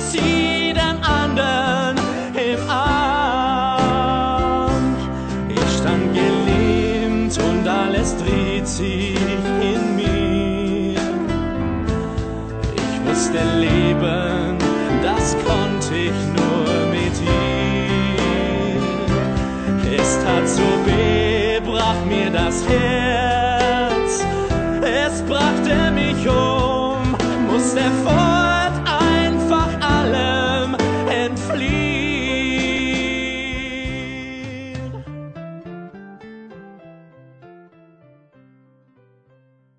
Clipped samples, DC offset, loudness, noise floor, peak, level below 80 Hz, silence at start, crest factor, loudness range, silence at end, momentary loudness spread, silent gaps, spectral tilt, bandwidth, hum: under 0.1%; under 0.1%; -18 LUFS; -56 dBFS; -4 dBFS; -32 dBFS; 0 s; 16 dB; 4 LU; 2.25 s; 8 LU; none; -5 dB/octave; 9.2 kHz; none